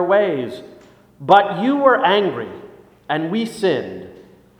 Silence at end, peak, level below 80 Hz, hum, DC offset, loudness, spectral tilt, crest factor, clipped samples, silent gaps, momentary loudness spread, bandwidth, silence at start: 0.4 s; 0 dBFS; -62 dBFS; none; under 0.1%; -17 LUFS; -6 dB/octave; 18 dB; under 0.1%; none; 19 LU; 15.5 kHz; 0 s